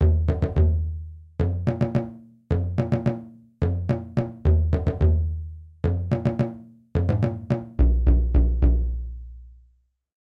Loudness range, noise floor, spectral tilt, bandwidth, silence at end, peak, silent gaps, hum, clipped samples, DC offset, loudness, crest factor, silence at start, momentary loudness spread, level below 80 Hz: 3 LU; -62 dBFS; -10.5 dB/octave; 5.2 kHz; 0.8 s; -8 dBFS; none; none; under 0.1%; under 0.1%; -24 LUFS; 14 dB; 0 s; 13 LU; -26 dBFS